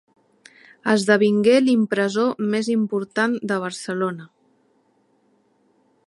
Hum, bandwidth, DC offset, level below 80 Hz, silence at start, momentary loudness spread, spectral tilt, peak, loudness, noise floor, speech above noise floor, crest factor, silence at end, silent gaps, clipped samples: none; 11.5 kHz; under 0.1%; -72 dBFS; 0.85 s; 10 LU; -5.5 dB/octave; -2 dBFS; -20 LUFS; -63 dBFS; 43 dB; 20 dB; 1.8 s; none; under 0.1%